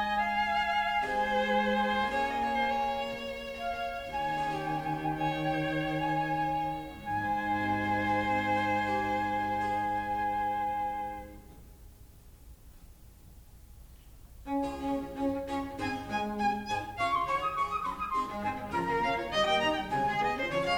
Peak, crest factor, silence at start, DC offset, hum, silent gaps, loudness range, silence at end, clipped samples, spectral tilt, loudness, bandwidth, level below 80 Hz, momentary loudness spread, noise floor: -16 dBFS; 16 dB; 0 s; under 0.1%; none; none; 8 LU; 0 s; under 0.1%; -5 dB/octave; -31 LUFS; over 20 kHz; -52 dBFS; 7 LU; -53 dBFS